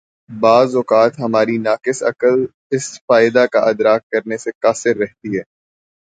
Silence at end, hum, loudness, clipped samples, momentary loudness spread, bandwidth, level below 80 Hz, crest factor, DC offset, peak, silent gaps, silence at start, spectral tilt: 0.7 s; none; -16 LUFS; under 0.1%; 10 LU; 9.4 kHz; -62 dBFS; 16 dB; under 0.1%; 0 dBFS; 2.54-2.70 s, 3.01-3.08 s, 4.03-4.10 s, 4.55-4.61 s; 0.3 s; -5 dB/octave